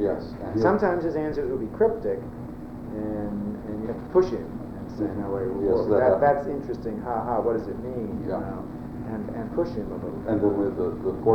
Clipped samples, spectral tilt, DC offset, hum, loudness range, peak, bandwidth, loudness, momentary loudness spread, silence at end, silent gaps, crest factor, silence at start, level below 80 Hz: under 0.1%; -9 dB/octave; under 0.1%; none; 5 LU; -6 dBFS; 8.4 kHz; -27 LUFS; 12 LU; 0 s; none; 20 dB; 0 s; -46 dBFS